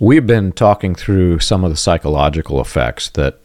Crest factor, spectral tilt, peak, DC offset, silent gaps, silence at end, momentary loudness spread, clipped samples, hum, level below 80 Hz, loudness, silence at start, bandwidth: 12 dB; -6 dB/octave; 0 dBFS; under 0.1%; none; 0.15 s; 7 LU; under 0.1%; none; -28 dBFS; -14 LUFS; 0 s; 14 kHz